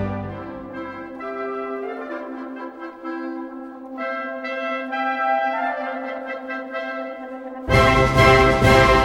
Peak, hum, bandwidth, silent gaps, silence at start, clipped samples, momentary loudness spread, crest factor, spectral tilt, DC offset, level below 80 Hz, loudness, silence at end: 0 dBFS; none; 17 kHz; none; 0 s; under 0.1%; 19 LU; 20 dB; -5.5 dB/octave; under 0.1%; -34 dBFS; -21 LUFS; 0 s